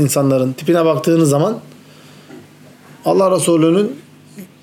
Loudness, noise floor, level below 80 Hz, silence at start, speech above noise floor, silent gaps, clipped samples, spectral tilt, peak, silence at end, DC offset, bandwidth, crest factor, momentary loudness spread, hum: -14 LUFS; -42 dBFS; -68 dBFS; 0 s; 29 dB; none; under 0.1%; -6 dB/octave; -4 dBFS; 0.2 s; under 0.1%; 17.5 kHz; 12 dB; 10 LU; none